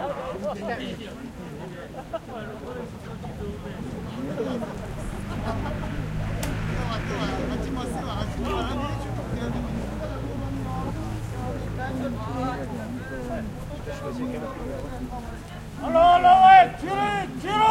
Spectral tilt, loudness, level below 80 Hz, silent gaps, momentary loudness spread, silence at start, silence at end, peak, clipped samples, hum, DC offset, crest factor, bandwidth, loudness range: -6 dB/octave; -25 LUFS; -38 dBFS; none; 15 LU; 0 s; 0 s; -4 dBFS; under 0.1%; none; under 0.1%; 22 dB; 16 kHz; 14 LU